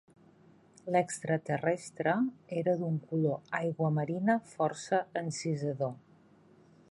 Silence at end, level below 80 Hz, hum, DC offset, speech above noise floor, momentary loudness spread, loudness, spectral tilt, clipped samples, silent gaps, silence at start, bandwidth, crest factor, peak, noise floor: 0.95 s; -78 dBFS; none; under 0.1%; 29 dB; 5 LU; -33 LUFS; -6.5 dB/octave; under 0.1%; none; 0.85 s; 11.5 kHz; 18 dB; -14 dBFS; -61 dBFS